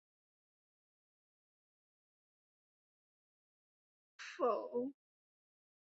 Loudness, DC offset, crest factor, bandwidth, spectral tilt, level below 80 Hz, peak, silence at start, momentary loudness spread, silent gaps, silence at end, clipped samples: -40 LUFS; under 0.1%; 24 dB; 6 kHz; -2.5 dB/octave; under -90 dBFS; -24 dBFS; 4.2 s; 14 LU; none; 1.05 s; under 0.1%